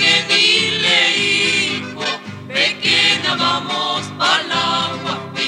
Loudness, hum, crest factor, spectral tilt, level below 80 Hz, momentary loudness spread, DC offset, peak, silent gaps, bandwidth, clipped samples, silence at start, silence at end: -15 LUFS; none; 16 dB; -2 dB/octave; -66 dBFS; 11 LU; under 0.1%; -2 dBFS; none; 16 kHz; under 0.1%; 0 s; 0 s